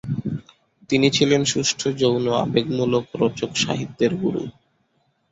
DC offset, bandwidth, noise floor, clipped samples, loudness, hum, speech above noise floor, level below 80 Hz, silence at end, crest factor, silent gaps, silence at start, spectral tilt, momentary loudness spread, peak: under 0.1%; 8.2 kHz; -67 dBFS; under 0.1%; -21 LUFS; none; 46 dB; -54 dBFS; 0.8 s; 18 dB; none; 0.05 s; -4.5 dB/octave; 10 LU; -4 dBFS